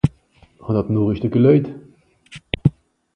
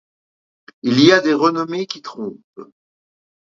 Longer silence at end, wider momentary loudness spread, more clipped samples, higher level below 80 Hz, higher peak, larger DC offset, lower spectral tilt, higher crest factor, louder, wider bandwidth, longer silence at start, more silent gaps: second, 0.45 s vs 0.95 s; about the same, 17 LU vs 18 LU; neither; first, -42 dBFS vs -64 dBFS; about the same, 0 dBFS vs 0 dBFS; neither; first, -9.5 dB/octave vs -5 dB/octave; about the same, 18 dB vs 20 dB; second, -19 LUFS vs -16 LUFS; first, 9.6 kHz vs 7.6 kHz; second, 0.05 s vs 0.85 s; second, none vs 2.44-2.53 s